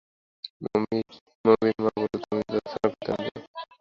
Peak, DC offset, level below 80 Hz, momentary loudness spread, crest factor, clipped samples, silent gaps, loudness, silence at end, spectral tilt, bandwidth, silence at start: -4 dBFS; under 0.1%; -60 dBFS; 19 LU; 22 dB; under 0.1%; 0.50-0.60 s, 1.21-1.26 s, 1.35-1.44 s, 3.47-3.54 s; -27 LUFS; 0.15 s; -7.5 dB/octave; 7 kHz; 0.45 s